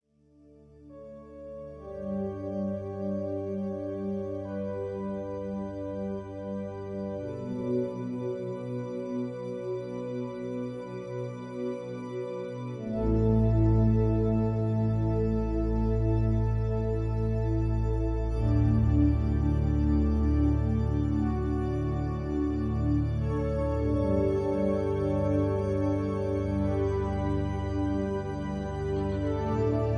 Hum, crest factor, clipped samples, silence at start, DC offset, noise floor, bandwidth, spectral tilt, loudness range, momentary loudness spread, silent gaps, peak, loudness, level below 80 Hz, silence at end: none; 16 dB; under 0.1%; 0.8 s; under 0.1%; -60 dBFS; 6.4 kHz; -10 dB/octave; 9 LU; 11 LU; none; -12 dBFS; -30 LUFS; -36 dBFS; 0 s